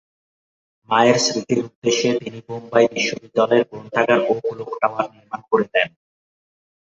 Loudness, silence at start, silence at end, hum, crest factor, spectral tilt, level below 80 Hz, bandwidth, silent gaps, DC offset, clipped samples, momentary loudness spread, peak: -19 LUFS; 0.9 s; 0.95 s; none; 18 dB; -3.5 dB/octave; -64 dBFS; 8 kHz; 1.75-1.82 s; under 0.1%; under 0.1%; 10 LU; -2 dBFS